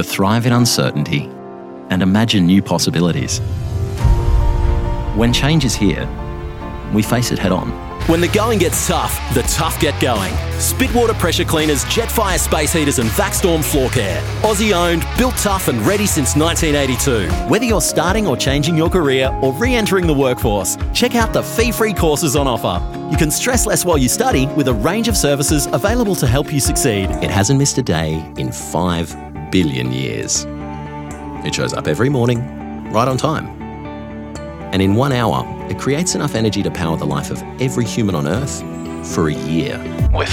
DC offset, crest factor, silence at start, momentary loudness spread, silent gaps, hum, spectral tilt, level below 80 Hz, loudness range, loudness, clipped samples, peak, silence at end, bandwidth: under 0.1%; 14 dB; 0 s; 9 LU; none; none; -4.5 dB/octave; -26 dBFS; 4 LU; -16 LUFS; under 0.1%; -2 dBFS; 0 s; 17.5 kHz